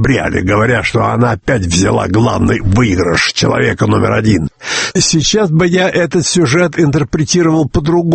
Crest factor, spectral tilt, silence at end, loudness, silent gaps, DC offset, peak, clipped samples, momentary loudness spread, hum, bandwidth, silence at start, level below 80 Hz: 12 dB; -5 dB/octave; 0 s; -12 LUFS; none; under 0.1%; 0 dBFS; under 0.1%; 3 LU; none; 8.8 kHz; 0 s; -32 dBFS